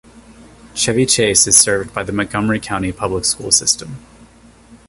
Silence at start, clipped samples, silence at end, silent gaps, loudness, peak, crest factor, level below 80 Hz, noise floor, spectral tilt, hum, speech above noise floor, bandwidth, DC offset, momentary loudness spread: 0.15 s; under 0.1%; 0.15 s; none; -14 LUFS; 0 dBFS; 18 dB; -42 dBFS; -45 dBFS; -2.5 dB/octave; none; 28 dB; 16 kHz; under 0.1%; 12 LU